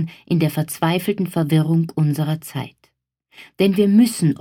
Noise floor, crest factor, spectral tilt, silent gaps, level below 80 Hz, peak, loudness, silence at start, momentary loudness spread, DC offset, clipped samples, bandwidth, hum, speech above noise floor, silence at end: -63 dBFS; 16 dB; -6.5 dB/octave; none; -62 dBFS; -4 dBFS; -19 LUFS; 0 s; 10 LU; under 0.1%; under 0.1%; 17.5 kHz; none; 45 dB; 0.05 s